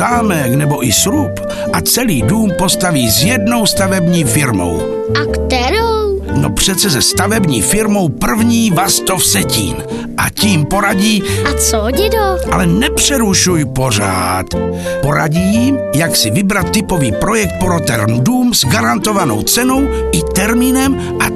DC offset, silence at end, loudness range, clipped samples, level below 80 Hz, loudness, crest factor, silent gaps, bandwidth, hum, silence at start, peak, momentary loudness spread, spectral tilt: under 0.1%; 0 s; 1 LU; under 0.1%; -28 dBFS; -12 LUFS; 12 dB; none; 13.5 kHz; none; 0 s; 0 dBFS; 5 LU; -4 dB/octave